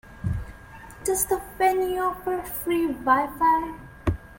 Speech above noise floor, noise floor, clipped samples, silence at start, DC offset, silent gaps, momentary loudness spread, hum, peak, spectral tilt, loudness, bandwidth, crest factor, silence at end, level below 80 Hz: 20 dB; -44 dBFS; under 0.1%; 0.05 s; under 0.1%; none; 12 LU; none; -6 dBFS; -5 dB/octave; -25 LUFS; 17 kHz; 18 dB; 0 s; -44 dBFS